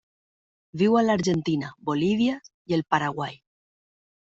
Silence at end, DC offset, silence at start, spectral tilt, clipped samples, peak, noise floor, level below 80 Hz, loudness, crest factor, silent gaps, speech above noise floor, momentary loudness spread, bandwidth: 1.05 s; under 0.1%; 0.75 s; -6 dB/octave; under 0.1%; -6 dBFS; under -90 dBFS; -62 dBFS; -25 LUFS; 20 dB; 2.54-2.65 s; over 66 dB; 13 LU; 8 kHz